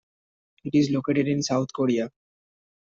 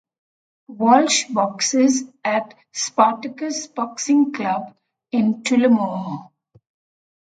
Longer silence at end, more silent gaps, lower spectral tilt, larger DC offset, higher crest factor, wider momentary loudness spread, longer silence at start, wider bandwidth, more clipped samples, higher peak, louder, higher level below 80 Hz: second, 0.8 s vs 1 s; neither; first, -6 dB/octave vs -3.5 dB/octave; neither; about the same, 16 dB vs 20 dB; second, 7 LU vs 12 LU; about the same, 0.65 s vs 0.7 s; second, 7.6 kHz vs 9.4 kHz; neither; second, -10 dBFS vs 0 dBFS; second, -24 LUFS vs -19 LUFS; about the same, -66 dBFS vs -70 dBFS